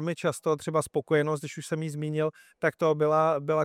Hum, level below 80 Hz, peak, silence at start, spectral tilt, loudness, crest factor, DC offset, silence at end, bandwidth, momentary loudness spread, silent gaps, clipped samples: none; -72 dBFS; -10 dBFS; 0 s; -6 dB/octave; -28 LUFS; 16 dB; under 0.1%; 0 s; 15 kHz; 9 LU; none; under 0.1%